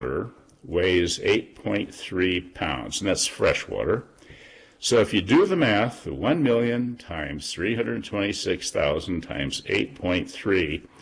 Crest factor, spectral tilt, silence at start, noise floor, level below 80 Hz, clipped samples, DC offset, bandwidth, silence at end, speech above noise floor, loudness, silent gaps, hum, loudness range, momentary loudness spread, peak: 14 dB; -4.5 dB/octave; 0 s; -49 dBFS; -48 dBFS; under 0.1%; under 0.1%; 10.5 kHz; 0.2 s; 25 dB; -25 LUFS; none; none; 3 LU; 9 LU; -10 dBFS